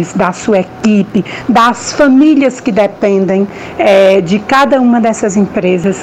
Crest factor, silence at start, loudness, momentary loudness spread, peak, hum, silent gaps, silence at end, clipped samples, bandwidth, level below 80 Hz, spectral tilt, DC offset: 8 dB; 0 s; -10 LUFS; 6 LU; 0 dBFS; none; none; 0 s; under 0.1%; 12 kHz; -44 dBFS; -5.5 dB/octave; under 0.1%